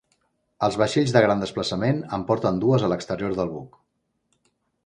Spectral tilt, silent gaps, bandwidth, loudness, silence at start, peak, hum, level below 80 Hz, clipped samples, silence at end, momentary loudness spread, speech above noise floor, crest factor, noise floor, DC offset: -6 dB/octave; none; 10.5 kHz; -23 LUFS; 0.6 s; -2 dBFS; none; -54 dBFS; under 0.1%; 1.2 s; 8 LU; 52 dB; 22 dB; -74 dBFS; under 0.1%